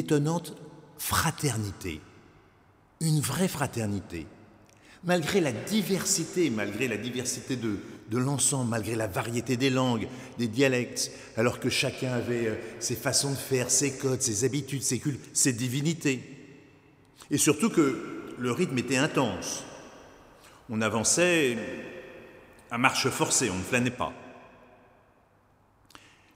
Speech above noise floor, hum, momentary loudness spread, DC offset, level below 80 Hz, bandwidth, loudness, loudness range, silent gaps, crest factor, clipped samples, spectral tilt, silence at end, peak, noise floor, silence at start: 35 dB; none; 13 LU; under 0.1%; -60 dBFS; 16 kHz; -28 LUFS; 4 LU; none; 24 dB; under 0.1%; -4 dB/octave; 1.9 s; -4 dBFS; -63 dBFS; 0 s